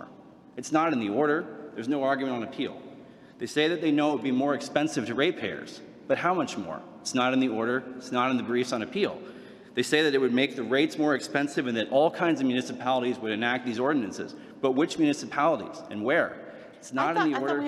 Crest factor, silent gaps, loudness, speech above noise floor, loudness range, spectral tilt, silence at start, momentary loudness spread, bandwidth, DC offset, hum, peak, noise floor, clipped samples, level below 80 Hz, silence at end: 20 dB; none; -27 LUFS; 24 dB; 3 LU; -4.5 dB/octave; 0 s; 14 LU; 13 kHz; under 0.1%; none; -8 dBFS; -50 dBFS; under 0.1%; -74 dBFS; 0 s